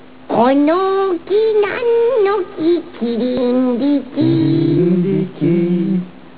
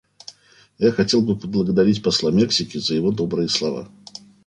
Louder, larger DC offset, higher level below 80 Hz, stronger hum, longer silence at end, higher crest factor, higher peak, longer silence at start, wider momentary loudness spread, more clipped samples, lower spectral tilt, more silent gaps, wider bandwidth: first, -15 LUFS vs -20 LUFS; first, 1% vs under 0.1%; about the same, -54 dBFS vs -52 dBFS; second, none vs 50 Hz at -40 dBFS; second, 0.25 s vs 0.6 s; about the same, 12 dB vs 16 dB; about the same, -2 dBFS vs -4 dBFS; about the same, 0.3 s vs 0.3 s; second, 5 LU vs 22 LU; neither; first, -12 dB/octave vs -5 dB/octave; neither; second, 4 kHz vs 10 kHz